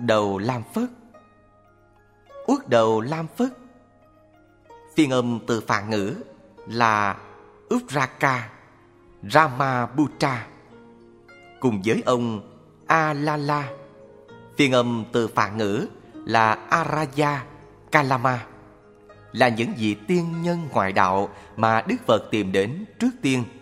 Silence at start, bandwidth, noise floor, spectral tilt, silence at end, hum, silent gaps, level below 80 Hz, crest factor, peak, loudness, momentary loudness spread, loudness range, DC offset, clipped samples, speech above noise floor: 0 s; 16 kHz; -56 dBFS; -5.5 dB/octave; 0.05 s; none; none; -60 dBFS; 24 dB; 0 dBFS; -23 LUFS; 12 LU; 3 LU; under 0.1%; under 0.1%; 34 dB